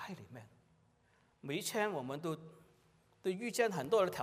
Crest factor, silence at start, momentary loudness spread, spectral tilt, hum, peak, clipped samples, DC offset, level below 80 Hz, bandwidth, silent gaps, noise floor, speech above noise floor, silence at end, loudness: 20 dB; 0 s; 20 LU; -4.5 dB/octave; none; -18 dBFS; under 0.1%; under 0.1%; -80 dBFS; 15.5 kHz; none; -72 dBFS; 36 dB; 0 s; -38 LUFS